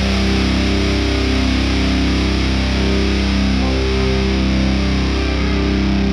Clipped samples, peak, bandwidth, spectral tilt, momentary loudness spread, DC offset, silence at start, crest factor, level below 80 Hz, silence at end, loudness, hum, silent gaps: under 0.1%; -4 dBFS; 10.5 kHz; -6 dB/octave; 1 LU; under 0.1%; 0 s; 12 dB; -20 dBFS; 0 s; -17 LUFS; none; none